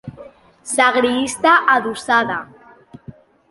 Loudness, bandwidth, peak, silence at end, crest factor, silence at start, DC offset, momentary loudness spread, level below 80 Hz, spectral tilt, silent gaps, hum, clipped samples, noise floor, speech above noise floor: -16 LUFS; 11.5 kHz; -2 dBFS; 0.4 s; 18 dB; 0.05 s; under 0.1%; 14 LU; -58 dBFS; -2.5 dB/octave; none; none; under 0.1%; -44 dBFS; 28 dB